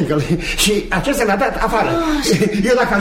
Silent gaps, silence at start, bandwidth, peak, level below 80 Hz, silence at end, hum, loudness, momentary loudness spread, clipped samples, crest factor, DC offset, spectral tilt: none; 0 s; 16.5 kHz; -2 dBFS; -30 dBFS; 0 s; none; -16 LUFS; 3 LU; under 0.1%; 14 dB; under 0.1%; -4.5 dB/octave